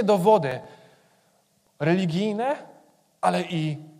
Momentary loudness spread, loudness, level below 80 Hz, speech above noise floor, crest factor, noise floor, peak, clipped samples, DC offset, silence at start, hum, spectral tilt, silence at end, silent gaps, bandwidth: 11 LU; -24 LUFS; -70 dBFS; 42 dB; 18 dB; -65 dBFS; -8 dBFS; under 0.1%; under 0.1%; 0 s; none; -6.5 dB/octave; 0.1 s; none; 15.5 kHz